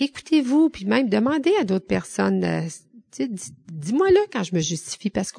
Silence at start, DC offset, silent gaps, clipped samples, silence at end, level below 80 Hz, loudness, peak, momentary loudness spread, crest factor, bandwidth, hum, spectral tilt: 0 s; under 0.1%; none; under 0.1%; 0 s; -54 dBFS; -22 LUFS; -6 dBFS; 12 LU; 16 dB; 10 kHz; none; -5.5 dB/octave